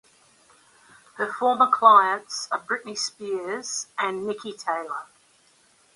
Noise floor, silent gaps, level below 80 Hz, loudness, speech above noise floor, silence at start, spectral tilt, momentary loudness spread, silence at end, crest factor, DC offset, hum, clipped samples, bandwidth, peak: -60 dBFS; none; -78 dBFS; -23 LUFS; 37 dB; 1.15 s; -1.5 dB/octave; 16 LU; 0.9 s; 22 dB; under 0.1%; none; under 0.1%; 11.5 kHz; -2 dBFS